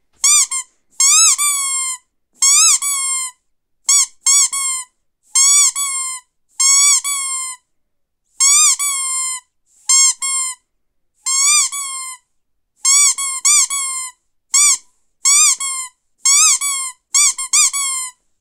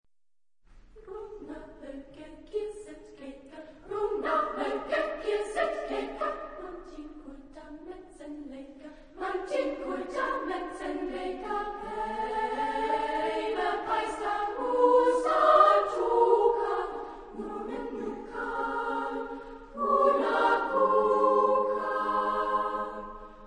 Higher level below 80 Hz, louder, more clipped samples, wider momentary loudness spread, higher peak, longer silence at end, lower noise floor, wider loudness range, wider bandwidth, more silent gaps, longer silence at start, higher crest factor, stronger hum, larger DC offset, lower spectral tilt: second, -68 dBFS vs -54 dBFS; first, -12 LUFS vs -28 LUFS; neither; second, 15 LU vs 22 LU; first, 0 dBFS vs -8 dBFS; first, 0.3 s vs 0 s; second, -67 dBFS vs under -90 dBFS; second, 3 LU vs 14 LU; first, 17 kHz vs 10.5 kHz; neither; second, 0.25 s vs 0.7 s; second, 16 dB vs 22 dB; neither; neither; second, 8.5 dB/octave vs -4.5 dB/octave